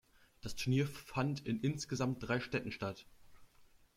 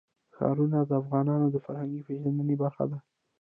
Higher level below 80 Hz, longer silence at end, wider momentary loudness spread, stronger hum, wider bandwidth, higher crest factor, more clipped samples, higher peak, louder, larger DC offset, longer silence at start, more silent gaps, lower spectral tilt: first, -62 dBFS vs -70 dBFS; about the same, 0.3 s vs 0.4 s; about the same, 10 LU vs 9 LU; neither; first, 16 kHz vs 2.7 kHz; about the same, 20 dB vs 16 dB; neither; second, -20 dBFS vs -12 dBFS; second, -38 LUFS vs -29 LUFS; neither; about the same, 0.45 s vs 0.4 s; neither; second, -6 dB/octave vs -13.5 dB/octave